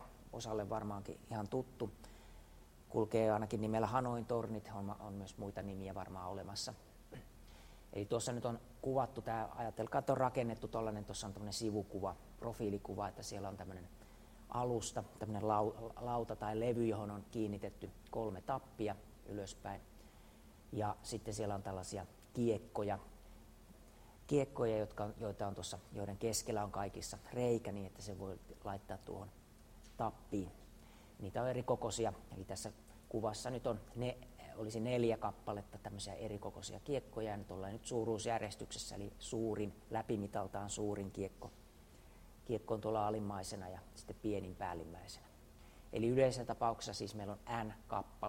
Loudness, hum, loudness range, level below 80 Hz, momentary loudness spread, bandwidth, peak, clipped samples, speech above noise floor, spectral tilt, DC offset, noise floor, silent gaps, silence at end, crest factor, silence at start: -42 LUFS; none; 5 LU; -60 dBFS; 20 LU; 16 kHz; -20 dBFS; under 0.1%; 20 dB; -5.5 dB/octave; under 0.1%; -61 dBFS; none; 0 s; 22 dB; 0 s